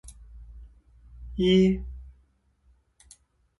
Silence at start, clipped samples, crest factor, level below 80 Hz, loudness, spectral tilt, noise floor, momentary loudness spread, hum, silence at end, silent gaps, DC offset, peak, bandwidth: 0.05 s; under 0.1%; 20 dB; -44 dBFS; -23 LUFS; -7 dB/octave; -65 dBFS; 28 LU; none; 1.55 s; none; under 0.1%; -10 dBFS; 11.5 kHz